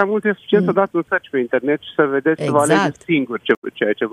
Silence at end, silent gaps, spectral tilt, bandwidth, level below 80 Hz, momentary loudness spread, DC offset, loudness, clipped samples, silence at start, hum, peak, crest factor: 0 s; 3.57-3.62 s; -5.5 dB/octave; 13 kHz; -64 dBFS; 5 LU; under 0.1%; -18 LUFS; under 0.1%; 0 s; none; 0 dBFS; 16 dB